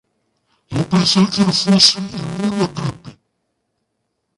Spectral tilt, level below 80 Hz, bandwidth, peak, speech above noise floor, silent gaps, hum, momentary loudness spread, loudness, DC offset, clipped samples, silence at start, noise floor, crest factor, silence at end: -4.5 dB/octave; -52 dBFS; 11.5 kHz; 0 dBFS; 57 dB; none; none; 15 LU; -15 LUFS; under 0.1%; under 0.1%; 0.7 s; -72 dBFS; 18 dB; 1.25 s